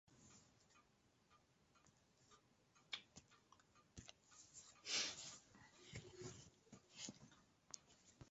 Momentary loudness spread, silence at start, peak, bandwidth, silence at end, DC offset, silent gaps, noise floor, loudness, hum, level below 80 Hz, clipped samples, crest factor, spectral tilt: 23 LU; 0.05 s; -30 dBFS; 8 kHz; 0 s; under 0.1%; none; -78 dBFS; -52 LUFS; none; -80 dBFS; under 0.1%; 28 dB; -1 dB/octave